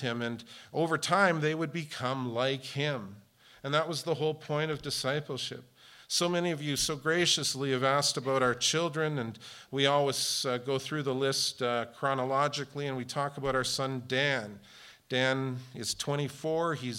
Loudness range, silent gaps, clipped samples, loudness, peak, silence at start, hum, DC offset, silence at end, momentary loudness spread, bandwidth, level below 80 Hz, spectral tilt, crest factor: 4 LU; none; under 0.1%; -30 LUFS; -12 dBFS; 0 s; none; under 0.1%; 0 s; 10 LU; 16.5 kHz; -64 dBFS; -3.5 dB/octave; 20 dB